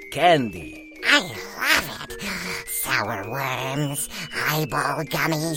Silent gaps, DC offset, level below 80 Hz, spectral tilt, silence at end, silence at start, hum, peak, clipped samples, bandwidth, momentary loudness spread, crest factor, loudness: none; under 0.1%; -50 dBFS; -3.5 dB/octave; 0 s; 0 s; none; 0 dBFS; under 0.1%; 17 kHz; 12 LU; 24 dB; -23 LUFS